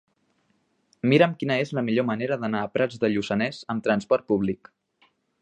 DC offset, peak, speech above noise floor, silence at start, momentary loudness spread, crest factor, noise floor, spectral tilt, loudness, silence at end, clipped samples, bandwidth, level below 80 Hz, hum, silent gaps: under 0.1%; -4 dBFS; 45 dB; 1.05 s; 8 LU; 20 dB; -69 dBFS; -7 dB/octave; -24 LUFS; 0.85 s; under 0.1%; 9.8 kHz; -62 dBFS; none; none